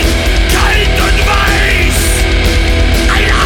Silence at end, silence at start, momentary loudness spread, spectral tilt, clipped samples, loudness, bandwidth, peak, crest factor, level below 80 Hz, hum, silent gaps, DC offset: 0 s; 0 s; 2 LU; -4 dB/octave; under 0.1%; -10 LUFS; 19 kHz; 0 dBFS; 8 dB; -12 dBFS; none; none; under 0.1%